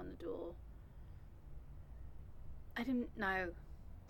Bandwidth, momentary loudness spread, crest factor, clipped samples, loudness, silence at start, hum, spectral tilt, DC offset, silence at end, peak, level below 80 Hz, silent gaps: 17.5 kHz; 19 LU; 22 dB; under 0.1%; -42 LUFS; 0 s; none; -7 dB/octave; under 0.1%; 0 s; -24 dBFS; -56 dBFS; none